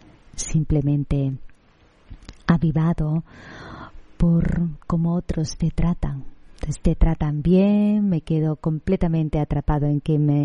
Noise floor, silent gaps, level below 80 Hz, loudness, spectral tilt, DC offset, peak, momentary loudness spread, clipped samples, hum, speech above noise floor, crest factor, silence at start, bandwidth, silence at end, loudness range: -55 dBFS; none; -30 dBFS; -22 LUFS; -8 dB/octave; under 0.1%; -2 dBFS; 16 LU; under 0.1%; none; 35 dB; 18 dB; 0.35 s; 10.5 kHz; 0 s; 4 LU